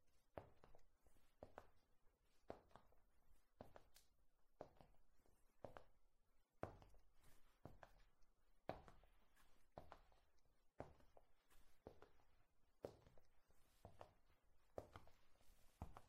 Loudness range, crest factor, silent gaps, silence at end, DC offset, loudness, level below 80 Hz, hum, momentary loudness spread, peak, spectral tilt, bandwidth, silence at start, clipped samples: 5 LU; 34 dB; none; 0 s; under 0.1%; -64 LUFS; -76 dBFS; none; 10 LU; -30 dBFS; -6 dB/octave; 15.5 kHz; 0 s; under 0.1%